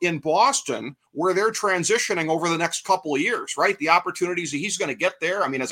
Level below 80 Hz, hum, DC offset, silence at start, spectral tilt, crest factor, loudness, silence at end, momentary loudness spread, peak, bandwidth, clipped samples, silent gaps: -72 dBFS; none; under 0.1%; 0 s; -3 dB/octave; 20 dB; -22 LUFS; 0 s; 6 LU; -2 dBFS; 16.5 kHz; under 0.1%; none